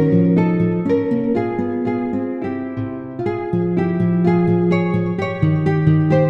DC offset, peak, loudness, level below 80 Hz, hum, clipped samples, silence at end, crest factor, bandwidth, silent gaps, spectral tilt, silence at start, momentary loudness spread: under 0.1%; -4 dBFS; -18 LUFS; -46 dBFS; none; under 0.1%; 0 s; 14 dB; 5.8 kHz; none; -10 dB/octave; 0 s; 9 LU